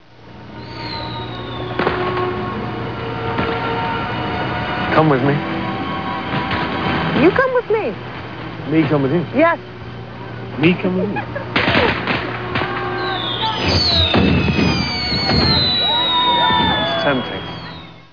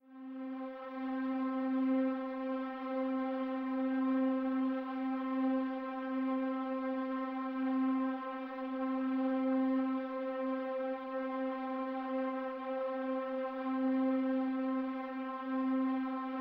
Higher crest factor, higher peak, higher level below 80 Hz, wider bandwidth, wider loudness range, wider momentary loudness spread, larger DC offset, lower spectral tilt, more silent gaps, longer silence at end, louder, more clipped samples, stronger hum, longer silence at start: first, 18 dB vs 12 dB; first, 0 dBFS vs -24 dBFS; first, -36 dBFS vs -80 dBFS; about the same, 5.4 kHz vs 5 kHz; first, 7 LU vs 2 LU; first, 15 LU vs 7 LU; first, 0.6% vs under 0.1%; second, -6 dB/octave vs -7.5 dB/octave; neither; about the same, 0.1 s vs 0 s; first, -17 LUFS vs -36 LUFS; neither; neither; about the same, 0.2 s vs 0.1 s